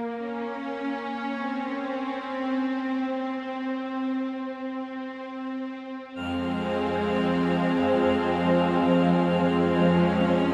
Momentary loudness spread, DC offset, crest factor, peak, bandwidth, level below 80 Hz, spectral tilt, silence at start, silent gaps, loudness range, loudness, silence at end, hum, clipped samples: 12 LU; under 0.1%; 16 dB; -10 dBFS; 8.6 kHz; -56 dBFS; -8 dB/octave; 0 s; none; 9 LU; -26 LUFS; 0 s; none; under 0.1%